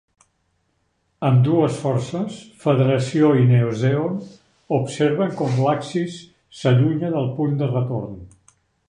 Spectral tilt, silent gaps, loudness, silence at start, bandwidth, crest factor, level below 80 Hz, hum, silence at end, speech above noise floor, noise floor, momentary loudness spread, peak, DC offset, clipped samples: -8 dB/octave; none; -20 LUFS; 1.2 s; 10 kHz; 16 dB; -58 dBFS; none; 0.6 s; 49 dB; -68 dBFS; 12 LU; -4 dBFS; under 0.1%; under 0.1%